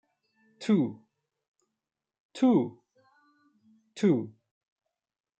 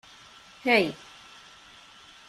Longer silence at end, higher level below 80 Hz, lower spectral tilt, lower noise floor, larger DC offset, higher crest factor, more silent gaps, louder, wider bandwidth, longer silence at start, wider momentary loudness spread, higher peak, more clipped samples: second, 1.1 s vs 1.35 s; second, -80 dBFS vs -68 dBFS; first, -7.5 dB/octave vs -4.5 dB/octave; first, -88 dBFS vs -52 dBFS; neither; second, 18 dB vs 24 dB; first, 1.48-1.54 s, 2.20-2.29 s vs none; second, -28 LUFS vs -25 LUFS; second, 8.8 kHz vs 14.5 kHz; about the same, 0.6 s vs 0.65 s; second, 20 LU vs 26 LU; second, -14 dBFS vs -6 dBFS; neither